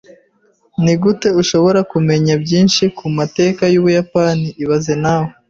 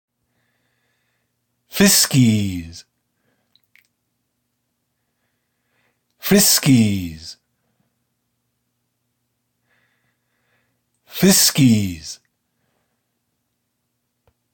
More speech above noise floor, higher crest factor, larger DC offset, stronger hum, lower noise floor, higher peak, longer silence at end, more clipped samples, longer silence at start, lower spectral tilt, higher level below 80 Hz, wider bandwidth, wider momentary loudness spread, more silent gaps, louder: second, 43 dB vs 58 dB; second, 12 dB vs 20 dB; neither; neither; second, -56 dBFS vs -73 dBFS; about the same, -2 dBFS vs -2 dBFS; second, 0.2 s vs 2.4 s; neither; second, 0.8 s vs 1.75 s; first, -6 dB/octave vs -3.5 dB/octave; first, -48 dBFS vs -54 dBFS; second, 7.8 kHz vs 17 kHz; second, 5 LU vs 22 LU; neither; about the same, -14 LUFS vs -15 LUFS